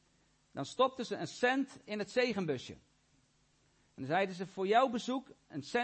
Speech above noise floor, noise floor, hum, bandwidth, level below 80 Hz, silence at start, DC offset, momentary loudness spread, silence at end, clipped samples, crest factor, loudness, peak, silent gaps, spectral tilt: 37 dB; -72 dBFS; none; 8.4 kHz; -76 dBFS; 0.55 s; under 0.1%; 16 LU; 0 s; under 0.1%; 20 dB; -35 LUFS; -16 dBFS; none; -5 dB/octave